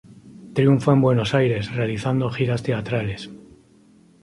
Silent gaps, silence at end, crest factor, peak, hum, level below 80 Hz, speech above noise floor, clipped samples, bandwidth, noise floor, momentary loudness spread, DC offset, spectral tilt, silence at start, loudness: none; 0.85 s; 18 dB; -4 dBFS; none; -50 dBFS; 33 dB; under 0.1%; 11.5 kHz; -53 dBFS; 11 LU; under 0.1%; -7.5 dB/octave; 0.25 s; -21 LUFS